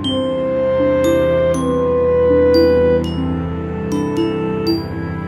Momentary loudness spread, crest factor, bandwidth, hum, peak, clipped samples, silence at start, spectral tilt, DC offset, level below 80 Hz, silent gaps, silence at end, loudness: 9 LU; 14 dB; 13 kHz; none; -2 dBFS; under 0.1%; 0 s; -7 dB/octave; under 0.1%; -34 dBFS; none; 0 s; -16 LUFS